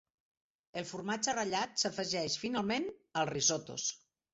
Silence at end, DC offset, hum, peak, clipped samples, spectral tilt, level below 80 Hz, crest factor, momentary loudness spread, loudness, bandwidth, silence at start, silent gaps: 0.35 s; under 0.1%; none; -18 dBFS; under 0.1%; -2.5 dB/octave; -72 dBFS; 20 dB; 10 LU; -34 LUFS; 8 kHz; 0.75 s; none